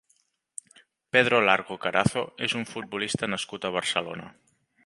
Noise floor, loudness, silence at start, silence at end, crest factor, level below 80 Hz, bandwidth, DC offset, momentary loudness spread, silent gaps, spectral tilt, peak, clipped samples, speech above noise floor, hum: -69 dBFS; -26 LUFS; 1.15 s; 0.55 s; 24 dB; -60 dBFS; 11.5 kHz; under 0.1%; 20 LU; none; -4 dB/octave; -4 dBFS; under 0.1%; 43 dB; none